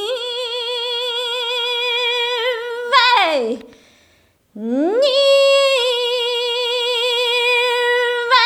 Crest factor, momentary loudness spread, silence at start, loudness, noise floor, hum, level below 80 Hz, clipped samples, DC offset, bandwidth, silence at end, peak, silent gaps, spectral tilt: 18 dB; 9 LU; 0 s; -16 LUFS; -56 dBFS; none; -68 dBFS; under 0.1%; under 0.1%; 17 kHz; 0 s; 0 dBFS; none; -1 dB/octave